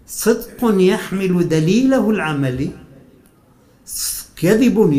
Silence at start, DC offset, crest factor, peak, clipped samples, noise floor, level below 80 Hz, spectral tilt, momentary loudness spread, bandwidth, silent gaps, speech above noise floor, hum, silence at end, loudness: 0.1 s; under 0.1%; 14 dB; -2 dBFS; under 0.1%; -51 dBFS; -44 dBFS; -5.5 dB/octave; 8 LU; 16 kHz; none; 36 dB; none; 0 s; -17 LUFS